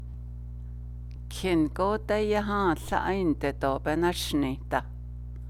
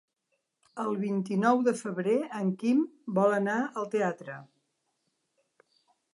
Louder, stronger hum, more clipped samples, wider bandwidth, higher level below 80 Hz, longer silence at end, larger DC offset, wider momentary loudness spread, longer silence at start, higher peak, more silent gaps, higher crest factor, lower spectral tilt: about the same, -28 LUFS vs -29 LUFS; first, 60 Hz at -40 dBFS vs none; neither; first, 16.5 kHz vs 11.5 kHz; first, -40 dBFS vs -84 dBFS; second, 0 s vs 1.7 s; neither; first, 15 LU vs 11 LU; second, 0 s vs 0.75 s; about the same, -10 dBFS vs -10 dBFS; neither; about the same, 18 dB vs 20 dB; second, -5.5 dB/octave vs -7 dB/octave